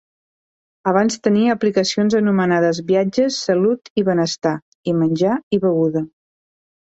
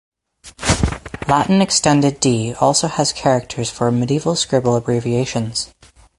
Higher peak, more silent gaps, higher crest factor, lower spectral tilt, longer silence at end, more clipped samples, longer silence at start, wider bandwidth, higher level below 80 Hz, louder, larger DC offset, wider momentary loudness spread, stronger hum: second, -4 dBFS vs 0 dBFS; first, 3.90-3.96 s, 4.62-4.84 s, 5.43-5.51 s vs none; about the same, 16 dB vs 16 dB; about the same, -5.5 dB/octave vs -4.5 dB/octave; first, 0.75 s vs 0.55 s; neither; first, 0.85 s vs 0.45 s; second, 8.2 kHz vs 11.5 kHz; second, -60 dBFS vs -36 dBFS; about the same, -18 LUFS vs -17 LUFS; neither; second, 6 LU vs 9 LU; neither